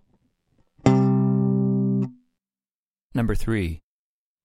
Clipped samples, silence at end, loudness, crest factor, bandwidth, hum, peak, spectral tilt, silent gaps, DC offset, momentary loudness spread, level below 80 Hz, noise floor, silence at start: under 0.1%; 0.65 s; -23 LUFS; 20 dB; 12 kHz; none; -4 dBFS; -8.5 dB/octave; 2.71-2.86 s, 3.03-3.10 s; under 0.1%; 12 LU; -38 dBFS; under -90 dBFS; 0.85 s